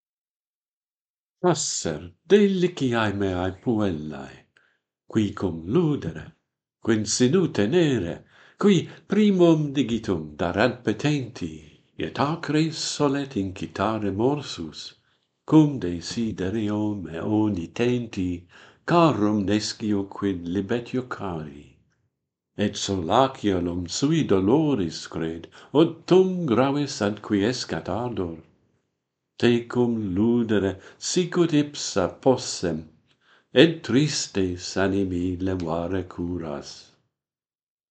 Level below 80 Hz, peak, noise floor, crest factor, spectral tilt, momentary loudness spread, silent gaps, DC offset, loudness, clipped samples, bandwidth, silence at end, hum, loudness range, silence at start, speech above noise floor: -56 dBFS; 0 dBFS; under -90 dBFS; 24 dB; -5.5 dB/octave; 13 LU; none; under 0.1%; -24 LUFS; under 0.1%; 9.2 kHz; 1.1 s; none; 5 LU; 1.45 s; over 67 dB